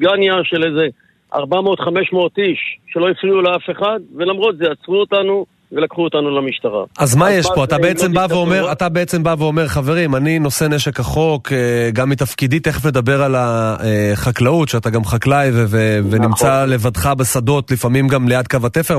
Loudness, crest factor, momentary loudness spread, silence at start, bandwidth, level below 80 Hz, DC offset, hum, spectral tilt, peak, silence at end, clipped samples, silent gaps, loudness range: -15 LUFS; 14 dB; 5 LU; 0 s; 14 kHz; -40 dBFS; under 0.1%; none; -5.5 dB/octave; -2 dBFS; 0 s; under 0.1%; none; 2 LU